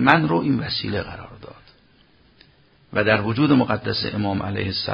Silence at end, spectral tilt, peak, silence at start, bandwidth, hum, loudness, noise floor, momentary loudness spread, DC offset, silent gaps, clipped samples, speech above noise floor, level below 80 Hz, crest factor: 0 s; -8.5 dB/octave; 0 dBFS; 0 s; 6 kHz; none; -21 LUFS; -56 dBFS; 15 LU; under 0.1%; none; under 0.1%; 35 dB; -46 dBFS; 22 dB